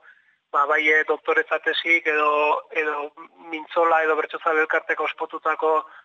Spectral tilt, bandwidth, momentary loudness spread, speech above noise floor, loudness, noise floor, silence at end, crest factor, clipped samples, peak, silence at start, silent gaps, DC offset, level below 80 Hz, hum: -2 dB/octave; 7.2 kHz; 9 LU; 33 dB; -21 LUFS; -55 dBFS; 0.05 s; 14 dB; under 0.1%; -8 dBFS; 0.55 s; none; under 0.1%; -84 dBFS; none